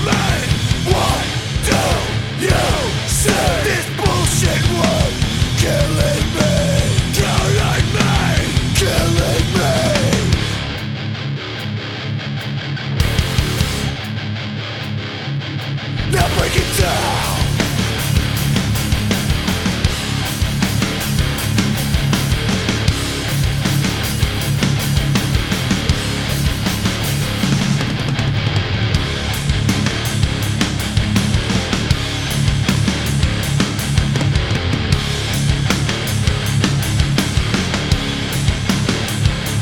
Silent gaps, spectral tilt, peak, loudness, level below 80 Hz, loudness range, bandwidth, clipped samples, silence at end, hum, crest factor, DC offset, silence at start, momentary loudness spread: none; -4.5 dB/octave; 0 dBFS; -17 LUFS; -26 dBFS; 4 LU; 19 kHz; under 0.1%; 0 s; none; 16 dB; under 0.1%; 0 s; 7 LU